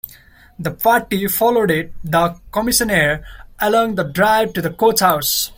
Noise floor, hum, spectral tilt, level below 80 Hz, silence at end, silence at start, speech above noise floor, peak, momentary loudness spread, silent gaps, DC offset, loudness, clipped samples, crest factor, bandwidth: -45 dBFS; none; -3.5 dB/octave; -42 dBFS; 0.05 s; 0.05 s; 29 dB; 0 dBFS; 7 LU; none; under 0.1%; -16 LUFS; under 0.1%; 16 dB; 17 kHz